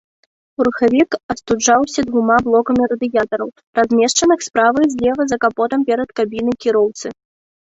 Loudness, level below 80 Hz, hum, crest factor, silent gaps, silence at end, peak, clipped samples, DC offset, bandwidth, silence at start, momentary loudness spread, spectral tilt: -16 LUFS; -50 dBFS; none; 16 dB; 1.23-1.29 s, 3.67-3.73 s; 0.6 s; 0 dBFS; under 0.1%; under 0.1%; 8.2 kHz; 0.6 s; 7 LU; -3.5 dB/octave